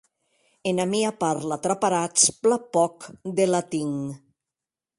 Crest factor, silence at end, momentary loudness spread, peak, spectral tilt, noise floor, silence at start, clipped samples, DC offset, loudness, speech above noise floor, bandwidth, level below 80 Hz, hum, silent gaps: 20 dB; 0.8 s; 12 LU; -4 dBFS; -3.5 dB/octave; -89 dBFS; 0.65 s; under 0.1%; under 0.1%; -23 LUFS; 65 dB; 11.5 kHz; -68 dBFS; none; none